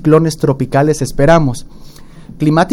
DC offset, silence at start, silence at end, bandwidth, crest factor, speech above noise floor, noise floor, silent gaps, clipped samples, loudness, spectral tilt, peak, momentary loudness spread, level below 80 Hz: under 0.1%; 0 s; 0 s; 15.5 kHz; 12 dB; 22 dB; -33 dBFS; none; under 0.1%; -13 LUFS; -6.5 dB/octave; 0 dBFS; 8 LU; -30 dBFS